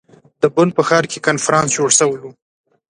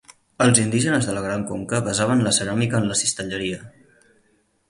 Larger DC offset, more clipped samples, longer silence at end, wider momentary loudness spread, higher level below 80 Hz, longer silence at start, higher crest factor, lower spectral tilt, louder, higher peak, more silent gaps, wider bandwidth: neither; neither; second, 0.6 s vs 1 s; second, 6 LU vs 10 LU; second, -58 dBFS vs -52 dBFS; first, 0.4 s vs 0.1 s; second, 16 dB vs 22 dB; about the same, -3.5 dB/octave vs -4 dB/octave; first, -15 LUFS vs -21 LUFS; about the same, 0 dBFS vs 0 dBFS; neither; about the same, 11.5 kHz vs 11.5 kHz